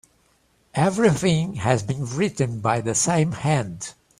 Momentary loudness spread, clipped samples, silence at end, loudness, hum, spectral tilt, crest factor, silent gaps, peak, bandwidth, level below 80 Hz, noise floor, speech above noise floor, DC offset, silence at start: 8 LU; under 0.1%; 0.3 s; -22 LUFS; none; -5 dB/octave; 20 dB; none; -2 dBFS; 14.5 kHz; -52 dBFS; -63 dBFS; 41 dB; under 0.1%; 0.75 s